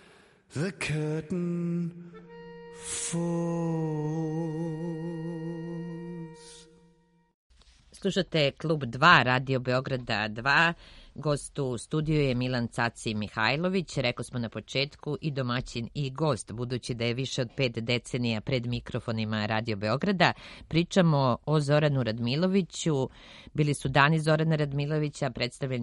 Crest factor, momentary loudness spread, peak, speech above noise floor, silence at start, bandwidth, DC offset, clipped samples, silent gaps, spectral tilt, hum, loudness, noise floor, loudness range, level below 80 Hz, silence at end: 24 dB; 13 LU; -4 dBFS; 35 dB; 0.5 s; 11.5 kHz; under 0.1%; under 0.1%; 7.34-7.50 s; -5.5 dB/octave; none; -28 LUFS; -63 dBFS; 8 LU; -54 dBFS; 0 s